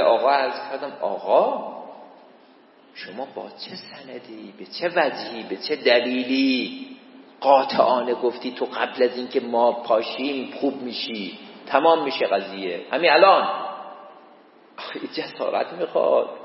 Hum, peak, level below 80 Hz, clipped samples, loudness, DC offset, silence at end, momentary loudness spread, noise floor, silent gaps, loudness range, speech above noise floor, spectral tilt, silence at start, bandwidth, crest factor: none; -2 dBFS; -84 dBFS; under 0.1%; -22 LUFS; under 0.1%; 0 s; 20 LU; -52 dBFS; none; 8 LU; 30 dB; -7.5 dB/octave; 0 s; 5.8 kHz; 22 dB